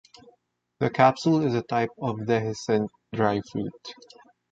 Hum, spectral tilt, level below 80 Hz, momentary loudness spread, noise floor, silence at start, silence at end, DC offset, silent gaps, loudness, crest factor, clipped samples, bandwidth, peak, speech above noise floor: none; -6.5 dB/octave; -62 dBFS; 13 LU; -68 dBFS; 0.8 s; 0.6 s; under 0.1%; none; -25 LUFS; 22 dB; under 0.1%; 8.2 kHz; -4 dBFS; 44 dB